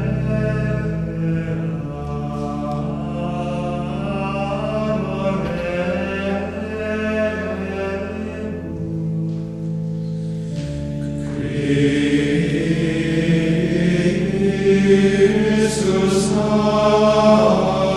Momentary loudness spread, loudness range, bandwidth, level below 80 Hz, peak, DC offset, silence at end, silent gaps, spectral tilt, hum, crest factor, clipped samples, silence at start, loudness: 11 LU; 9 LU; 12 kHz; -38 dBFS; -2 dBFS; under 0.1%; 0 s; none; -6.5 dB/octave; none; 16 dB; under 0.1%; 0 s; -20 LUFS